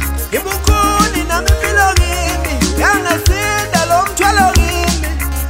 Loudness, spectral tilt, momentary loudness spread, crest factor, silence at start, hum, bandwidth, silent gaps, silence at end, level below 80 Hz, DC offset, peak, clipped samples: -13 LUFS; -4 dB/octave; 6 LU; 12 dB; 0 s; none; 16.5 kHz; none; 0 s; -18 dBFS; under 0.1%; 0 dBFS; under 0.1%